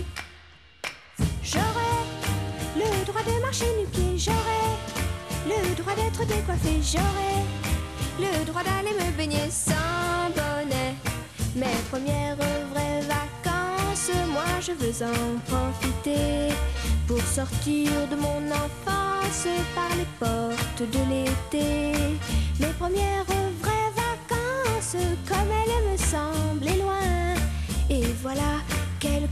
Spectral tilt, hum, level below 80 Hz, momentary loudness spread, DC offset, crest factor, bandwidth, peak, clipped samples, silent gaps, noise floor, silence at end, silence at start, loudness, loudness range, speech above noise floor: -4.5 dB/octave; none; -34 dBFS; 4 LU; 0.1%; 16 dB; 15 kHz; -10 dBFS; under 0.1%; none; -51 dBFS; 0 s; 0 s; -27 LUFS; 1 LU; 25 dB